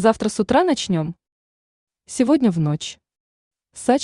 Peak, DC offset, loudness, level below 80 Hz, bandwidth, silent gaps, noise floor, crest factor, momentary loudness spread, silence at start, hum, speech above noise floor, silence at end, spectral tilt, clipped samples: -2 dBFS; under 0.1%; -20 LUFS; -54 dBFS; 11 kHz; 1.32-1.87 s, 3.20-3.51 s; under -90 dBFS; 18 dB; 12 LU; 0 s; none; over 71 dB; 0 s; -5.5 dB/octave; under 0.1%